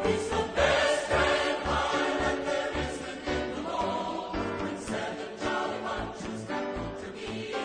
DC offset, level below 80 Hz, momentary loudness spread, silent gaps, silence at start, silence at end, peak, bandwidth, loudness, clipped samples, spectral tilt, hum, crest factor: under 0.1%; -46 dBFS; 11 LU; none; 0 s; 0 s; -10 dBFS; 9.8 kHz; -30 LUFS; under 0.1%; -4 dB/octave; none; 20 dB